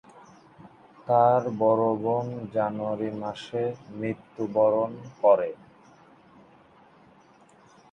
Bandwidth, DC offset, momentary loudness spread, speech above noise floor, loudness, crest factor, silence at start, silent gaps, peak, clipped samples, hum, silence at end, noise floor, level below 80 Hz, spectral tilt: 8.6 kHz; under 0.1%; 12 LU; 31 dB; -26 LUFS; 20 dB; 0.6 s; none; -8 dBFS; under 0.1%; none; 2.4 s; -56 dBFS; -70 dBFS; -8 dB/octave